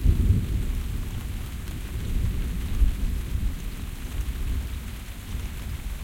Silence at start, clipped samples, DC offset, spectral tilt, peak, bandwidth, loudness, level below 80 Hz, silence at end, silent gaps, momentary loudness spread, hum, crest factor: 0 s; under 0.1%; under 0.1%; -6 dB/octave; -8 dBFS; 17 kHz; -31 LUFS; -28 dBFS; 0 s; none; 11 LU; none; 18 dB